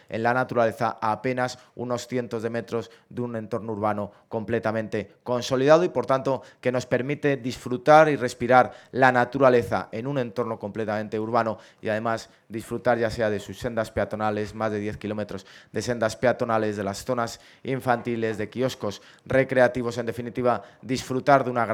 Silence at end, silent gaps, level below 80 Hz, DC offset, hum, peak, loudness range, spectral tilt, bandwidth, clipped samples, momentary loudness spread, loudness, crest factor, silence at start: 0 s; none; -58 dBFS; under 0.1%; none; -2 dBFS; 8 LU; -6 dB/octave; 15.5 kHz; under 0.1%; 12 LU; -25 LUFS; 22 dB; 0.1 s